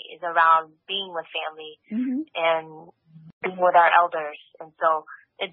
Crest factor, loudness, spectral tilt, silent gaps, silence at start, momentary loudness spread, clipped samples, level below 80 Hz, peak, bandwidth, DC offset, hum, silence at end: 20 dB; -23 LUFS; -0.5 dB/octave; 3.33-3.41 s; 0.05 s; 15 LU; under 0.1%; -82 dBFS; -4 dBFS; 4.7 kHz; under 0.1%; none; 0.05 s